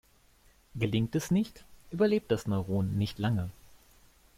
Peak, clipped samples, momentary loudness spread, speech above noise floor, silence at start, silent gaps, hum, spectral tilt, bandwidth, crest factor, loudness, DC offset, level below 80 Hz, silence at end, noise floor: -14 dBFS; under 0.1%; 11 LU; 33 dB; 0.75 s; none; none; -7 dB/octave; 16 kHz; 16 dB; -31 LUFS; under 0.1%; -56 dBFS; 0.85 s; -63 dBFS